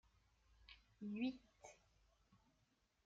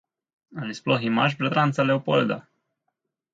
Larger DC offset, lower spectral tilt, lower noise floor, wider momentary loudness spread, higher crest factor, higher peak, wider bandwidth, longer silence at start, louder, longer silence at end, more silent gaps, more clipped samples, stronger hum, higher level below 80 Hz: neither; second, -5 dB/octave vs -6.5 dB/octave; about the same, -82 dBFS vs -79 dBFS; first, 19 LU vs 13 LU; about the same, 20 dB vs 18 dB; second, -34 dBFS vs -6 dBFS; about the same, 7.4 kHz vs 7.8 kHz; about the same, 0.6 s vs 0.5 s; second, -49 LUFS vs -23 LUFS; second, 0.7 s vs 0.95 s; neither; neither; neither; second, -78 dBFS vs -68 dBFS